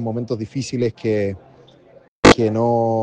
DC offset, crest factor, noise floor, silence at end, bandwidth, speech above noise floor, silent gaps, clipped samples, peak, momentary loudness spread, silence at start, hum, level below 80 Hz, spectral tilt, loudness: under 0.1%; 18 dB; -48 dBFS; 0 s; 10 kHz; 28 dB; 2.08-2.23 s; under 0.1%; -2 dBFS; 13 LU; 0 s; none; -42 dBFS; -5.5 dB/octave; -18 LUFS